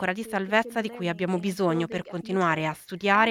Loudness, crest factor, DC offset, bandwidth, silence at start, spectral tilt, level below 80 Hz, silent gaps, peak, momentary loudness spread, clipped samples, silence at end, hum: -27 LUFS; 18 dB; under 0.1%; 15.5 kHz; 0 s; -5.5 dB/octave; -66 dBFS; none; -6 dBFS; 7 LU; under 0.1%; 0 s; none